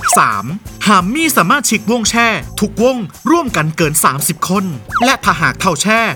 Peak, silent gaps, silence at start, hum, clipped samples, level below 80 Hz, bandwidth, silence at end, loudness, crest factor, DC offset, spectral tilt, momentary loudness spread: 0 dBFS; none; 0 s; none; under 0.1%; -38 dBFS; over 20 kHz; 0 s; -13 LUFS; 14 dB; under 0.1%; -3.5 dB/octave; 7 LU